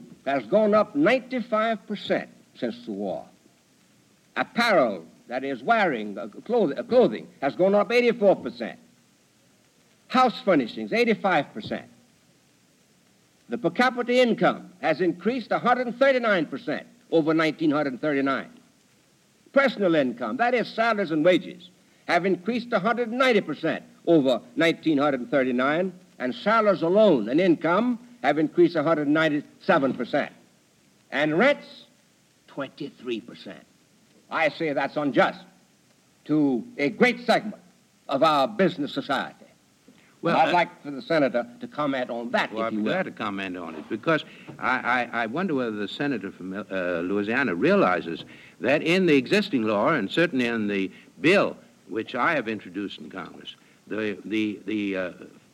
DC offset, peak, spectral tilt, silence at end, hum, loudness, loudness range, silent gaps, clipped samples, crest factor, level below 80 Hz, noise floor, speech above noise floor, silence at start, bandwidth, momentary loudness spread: under 0.1%; -6 dBFS; -6 dB/octave; 0.25 s; none; -24 LUFS; 5 LU; none; under 0.1%; 20 dB; -72 dBFS; -61 dBFS; 37 dB; 0 s; 13 kHz; 13 LU